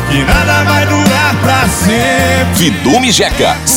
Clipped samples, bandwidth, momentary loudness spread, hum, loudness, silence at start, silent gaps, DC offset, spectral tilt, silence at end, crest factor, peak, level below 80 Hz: under 0.1%; 17.5 kHz; 2 LU; none; -9 LUFS; 0 s; none; under 0.1%; -4 dB/octave; 0 s; 10 dB; 0 dBFS; -24 dBFS